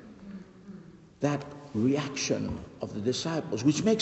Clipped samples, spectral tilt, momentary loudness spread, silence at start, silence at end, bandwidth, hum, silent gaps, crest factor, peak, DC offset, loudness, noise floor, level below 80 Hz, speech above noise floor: under 0.1%; -5 dB/octave; 20 LU; 0 s; 0 s; 8.4 kHz; none; none; 18 dB; -12 dBFS; under 0.1%; -30 LUFS; -49 dBFS; -58 dBFS; 21 dB